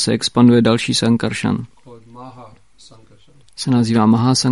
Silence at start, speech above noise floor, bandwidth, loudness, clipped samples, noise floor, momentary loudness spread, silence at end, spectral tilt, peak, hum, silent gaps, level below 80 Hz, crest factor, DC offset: 0 s; 36 dB; 11.5 kHz; -15 LUFS; under 0.1%; -50 dBFS; 14 LU; 0 s; -5.5 dB/octave; -2 dBFS; none; none; -52 dBFS; 16 dB; 0.4%